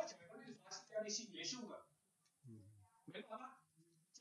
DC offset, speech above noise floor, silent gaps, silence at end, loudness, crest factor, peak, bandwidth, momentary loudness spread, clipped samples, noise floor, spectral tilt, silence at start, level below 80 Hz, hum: under 0.1%; 31 dB; none; 0 s; -50 LUFS; 22 dB; -30 dBFS; 11 kHz; 21 LU; under 0.1%; -81 dBFS; -2 dB/octave; 0 s; under -90 dBFS; none